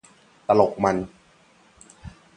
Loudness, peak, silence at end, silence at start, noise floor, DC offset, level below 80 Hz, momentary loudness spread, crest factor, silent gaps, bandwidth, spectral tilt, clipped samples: -22 LUFS; -2 dBFS; 0.25 s; 0.5 s; -57 dBFS; under 0.1%; -54 dBFS; 25 LU; 22 dB; none; 10 kHz; -6.5 dB/octave; under 0.1%